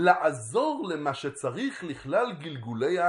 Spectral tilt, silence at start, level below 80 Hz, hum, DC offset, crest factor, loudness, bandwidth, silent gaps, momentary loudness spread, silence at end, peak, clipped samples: -5 dB/octave; 0 s; -68 dBFS; none; under 0.1%; 22 dB; -29 LUFS; 11.5 kHz; none; 8 LU; 0 s; -6 dBFS; under 0.1%